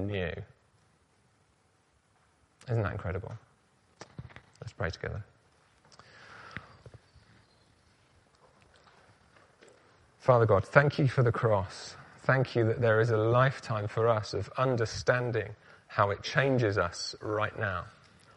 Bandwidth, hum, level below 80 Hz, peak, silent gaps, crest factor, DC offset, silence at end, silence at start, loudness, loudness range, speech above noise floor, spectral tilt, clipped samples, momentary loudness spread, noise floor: 9.6 kHz; none; -58 dBFS; -6 dBFS; none; 26 dB; under 0.1%; 0.45 s; 0 s; -29 LUFS; 16 LU; 40 dB; -6.5 dB/octave; under 0.1%; 21 LU; -69 dBFS